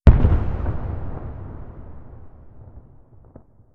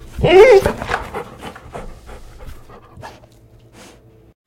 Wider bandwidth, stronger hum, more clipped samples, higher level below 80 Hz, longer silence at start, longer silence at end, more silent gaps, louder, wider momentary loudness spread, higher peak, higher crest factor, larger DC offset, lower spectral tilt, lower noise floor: second, 4.2 kHz vs 15.5 kHz; neither; neither; first, -24 dBFS vs -36 dBFS; about the same, 0.05 s vs 0.15 s; second, 0.95 s vs 1.4 s; neither; second, -23 LUFS vs -11 LUFS; about the same, 26 LU vs 27 LU; about the same, 0 dBFS vs 0 dBFS; about the same, 20 dB vs 18 dB; neither; first, -10.5 dB/octave vs -5.5 dB/octave; about the same, -48 dBFS vs -46 dBFS